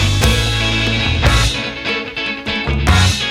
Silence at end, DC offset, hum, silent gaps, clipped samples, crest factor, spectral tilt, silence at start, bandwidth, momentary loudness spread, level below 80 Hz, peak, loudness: 0 s; under 0.1%; none; none; under 0.1%; 14 dB; -4 dB/octave; 0 s; 17 kHz; 7 LU; -22 dBFS; 0 dBFS; -15 LUFS